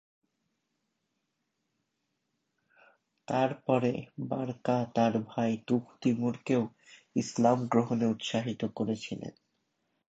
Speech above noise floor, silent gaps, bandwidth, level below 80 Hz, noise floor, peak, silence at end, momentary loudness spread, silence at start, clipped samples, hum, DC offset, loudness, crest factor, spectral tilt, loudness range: 52 dB; none; 8 kHz; -72 dBFS; -82 dBFS; -12 dBFS; 0.8 s; 9 LU; 3.3 s; under 0.1%; none; under 0.1%; -31 LUFS; 20 dB; -6.5 dB/octave; 5 LU